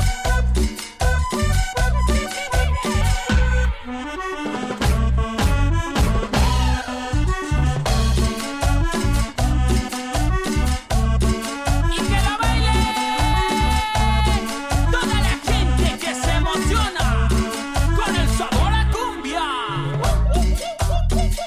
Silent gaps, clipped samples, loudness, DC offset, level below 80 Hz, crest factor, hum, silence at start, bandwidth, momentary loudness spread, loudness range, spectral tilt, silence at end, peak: none; under 0.1%; -21 LUFS; under 0.1%; -22 dBFS; 14 dB; none; 0 s; 15.5 kHz; 4 LU; 2 LU; -5 dB/octave; 0 s; -6 dBFS